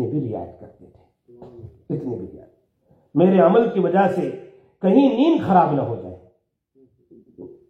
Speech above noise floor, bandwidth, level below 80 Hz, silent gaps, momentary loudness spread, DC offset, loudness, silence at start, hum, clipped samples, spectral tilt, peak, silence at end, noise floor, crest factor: 46 dB; 5.8 kHz; -62 dBFS; none; 18 LU; under 0.1%; -19 LUFS; 0 s; none; under 0.1%; -9.5 dB/octave; -2 dBFS; 0.25 s; -64 dBFS; 18 dB